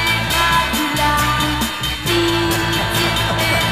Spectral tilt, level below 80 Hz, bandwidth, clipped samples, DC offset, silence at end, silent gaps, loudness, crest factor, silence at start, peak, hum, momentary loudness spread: -3.5 dB/octave; -30 dBFS; 15.5 kHz; under 0.1%; under 0.1%; 0 s; none; -16 LUFS; 14 dB; 0 s; -4 dBFS; none; 3 LU